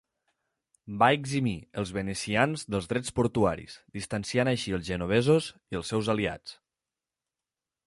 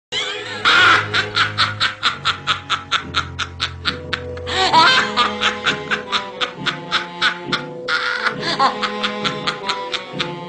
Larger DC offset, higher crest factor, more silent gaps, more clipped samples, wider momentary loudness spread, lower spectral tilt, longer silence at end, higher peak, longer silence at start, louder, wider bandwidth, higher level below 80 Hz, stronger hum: neither; about the same, 22 dB vs 20 dB; neither; neither; about the same, 13 LU vs 11 LU; first, -5.5 dB/octave vs -2.5 dB/octave; first, 1.35 s vs 0 s; second, -8 dBFS vs 0 dBFS; first, 0.85 s vs 0.1 s; second, -28 LUFS vs -18 LUFS; first, 11.5 kHz vs 10 kHz; about the same, -52 dBFS vs -48 dBFS; neither